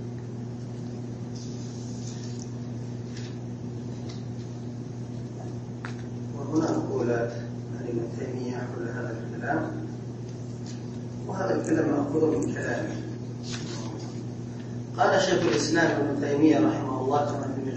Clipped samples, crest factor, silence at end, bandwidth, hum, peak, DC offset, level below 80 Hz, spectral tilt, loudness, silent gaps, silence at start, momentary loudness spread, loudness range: under 0.1%; 20 dB; 0 s; 8.6 kHz; none; -10 dBFS; under 0.1%; -56 dBFS; -6 dB/octave; -29 LUFS; none; 0 s; 13 LU; 11 LU